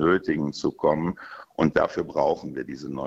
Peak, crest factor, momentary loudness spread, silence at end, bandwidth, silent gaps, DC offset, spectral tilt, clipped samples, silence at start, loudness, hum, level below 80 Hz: -4 dBFS; 22 dB; 12 LU; 0 s; 8 kHz; none; under 0.1%; -7 dB/octave; under 0.1%; 0 s; -25 LUFS; none; -54 dBFS